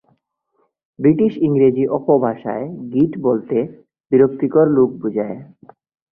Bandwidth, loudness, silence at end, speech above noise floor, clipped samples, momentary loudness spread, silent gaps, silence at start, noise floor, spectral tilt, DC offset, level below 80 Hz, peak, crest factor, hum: 3.5 kHz; -17 LUFS; 0.7 s; 50 dB; under 0.1%; 10 LU; 4.00-4.04 s; 1 s; -66 dBFS; -12.5 dB/octave; under 0.1%; -58 dBFS; -2 dBFS; 16 dB; none